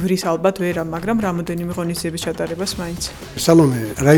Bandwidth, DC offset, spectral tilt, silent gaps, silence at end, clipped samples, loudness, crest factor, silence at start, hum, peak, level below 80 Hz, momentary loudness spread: 19.5 kHz; under 0.1%; -5.5 dB/octave; none; 0 s; under 0.1%; -20 LUFS; 18 dB; 0 s; none; 0 dBFS; -42 dBFS; 11 LU